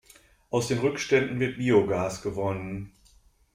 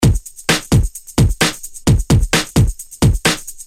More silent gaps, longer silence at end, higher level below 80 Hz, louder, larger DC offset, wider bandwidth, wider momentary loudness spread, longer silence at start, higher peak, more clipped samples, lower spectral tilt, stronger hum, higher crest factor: neither; first, 0.65 s vs 0.05 s; second, -56 dBFS vs -22 dBFS; second, -27 LUFS vs -16 LUFS; neither; about the same, 15.5 kHz vs 16.5 kHz; first, 12 LU vs 5 LU; first, 0.5 s vs 0 s; second, -8 dBFS vs -2 dBFS; neither; about the same, -5.5 dB/octave vs -4.5 dB/octave; neither; first, 20 dB vs 14 dB